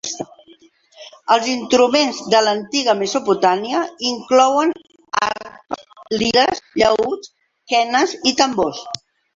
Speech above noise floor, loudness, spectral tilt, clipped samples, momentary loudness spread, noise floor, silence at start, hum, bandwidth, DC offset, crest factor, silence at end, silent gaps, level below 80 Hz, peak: 33 dB; -17 LUFS; -2.5 dB/octave; under 0.1%; 16 LU; -50 dBFS; 0.05 s; none; 7.8 kHz; under 0.1%; 18 dB; 0.4 s; none; -56 dBFS; -2 dBFS